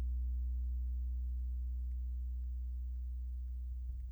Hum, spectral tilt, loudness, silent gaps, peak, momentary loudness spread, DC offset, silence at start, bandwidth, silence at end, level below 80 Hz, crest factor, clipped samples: none; -9 dB/octave; -42 LUFS; none; -34 dBFS; 5 LU; under 0.1%; 0 s; 0.3 kHz; 0 s; -38 dBFS; 6 dB; under 0.1%